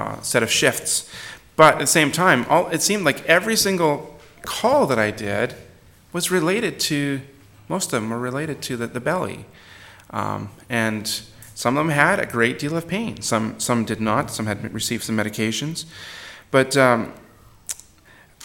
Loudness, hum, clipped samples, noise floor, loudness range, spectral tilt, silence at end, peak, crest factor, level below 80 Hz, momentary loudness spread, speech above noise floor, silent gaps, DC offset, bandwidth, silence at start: -20 LUFS; none; under 0.1%; -51 dBFS; 9 LU; -3.5 dB/octave; 0 s; 0 dBFS; 22 dB; -56 dBFS; 15 LU; 30 dB; none; under 0.1%; 17.5 kHz; 0 s